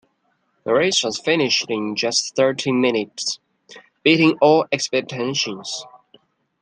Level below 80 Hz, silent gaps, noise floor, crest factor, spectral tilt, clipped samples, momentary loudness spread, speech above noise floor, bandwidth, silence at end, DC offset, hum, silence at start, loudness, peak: -68 dBFS; none; -67 dBFS; 18 dB; -3.5 dB/octave; under 0.1%; 11 LU; 48 dB; 10.5 kHz; 0.65 s; under 0.1%; none; 0.65 s; -19 LUFS; -2 dBFS